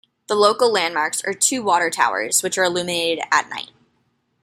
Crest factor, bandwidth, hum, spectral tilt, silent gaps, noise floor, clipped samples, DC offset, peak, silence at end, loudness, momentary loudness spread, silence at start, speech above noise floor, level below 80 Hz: 20 dB; 16 kHz; none; -1.5 dB/octave; none; -67 dBFS; under 0.1%; under 0.1%; -2 dBFS; 0.8 s; -19 LUFS; 7 LU; 0.3 s; 47 dB; -68 dBFS